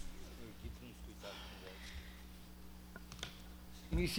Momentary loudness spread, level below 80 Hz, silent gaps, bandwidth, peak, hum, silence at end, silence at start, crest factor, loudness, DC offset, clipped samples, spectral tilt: 8 LU; -50 dBFS; none; over 20 kHz; -26 dBFS; 60 Hz at -55 dBFS; 0 s; 0 s; 20 dB; -50 LUFS; under 0.1%; under 0.1%; -4.5 dB/octave